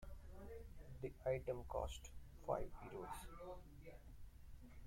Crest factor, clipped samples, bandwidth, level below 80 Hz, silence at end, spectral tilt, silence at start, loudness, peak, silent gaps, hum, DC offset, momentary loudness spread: 22 dB; under 0.1%; 16.5 kHz; -58 dBFS; 0 s; -6 dB/octave; 0 s; -50 LUFS; -28 dBFS; none; none; under 0.1%; 18 LU